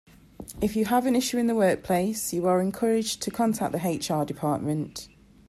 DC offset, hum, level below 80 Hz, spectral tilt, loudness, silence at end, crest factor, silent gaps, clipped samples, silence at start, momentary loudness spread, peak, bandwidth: under 0.1%; none; -54 dBFS; -5 dB/octave; -26 LUFS; 0.4 s; 16 dB; none; under 0.1%; 0.4 s; 8 LU; -10 dBFS; 14.5 kHz